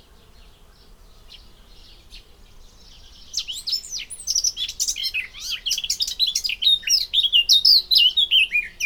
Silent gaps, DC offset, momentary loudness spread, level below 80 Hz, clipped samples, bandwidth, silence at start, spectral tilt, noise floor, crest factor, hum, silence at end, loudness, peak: none; under 0.1%; 15 LU; -50 dBFS; under 0.1%; over 20 kHz; 2.1 s; 3.5 dB/octave; -49 dBFS; 20 dB; none; 0 s; -18 LUFS; -4 dBFS